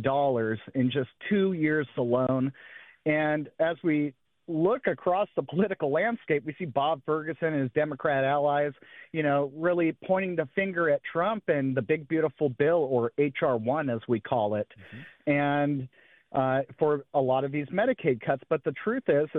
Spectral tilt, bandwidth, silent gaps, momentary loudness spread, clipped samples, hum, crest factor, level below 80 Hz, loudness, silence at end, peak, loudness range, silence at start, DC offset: -10.5 dB/octave; 4.1 kHz; none; 5 LU; under 0.1%; none; 16 dB; -70 dBFS; -28 LUFS; 0 s; -12 dBFS; 2 LU; 0 s; under 0.1%